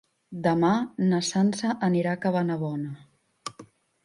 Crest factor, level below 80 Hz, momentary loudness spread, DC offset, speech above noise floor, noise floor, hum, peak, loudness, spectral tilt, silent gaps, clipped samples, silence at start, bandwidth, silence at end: 16 dB; -68 dBFS; 17 LU; under 0.1%; 27 dB; -51 dBFS; none; -10 dBFS; -25 LUFS; -6 dB/octave; none; under 0.1%; 0.3 s; 11 kHz; 0.4 s